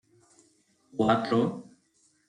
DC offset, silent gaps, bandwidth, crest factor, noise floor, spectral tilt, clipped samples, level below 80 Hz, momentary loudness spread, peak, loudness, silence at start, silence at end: under 0.1%; none; 10 kHz; 20 dB; -68 dBFS; -7 dB/octave; under 0.1%; -66 dBFS; 16 LU; -10 dBFS; -27 LUFS; 0.95 s; 0.65 s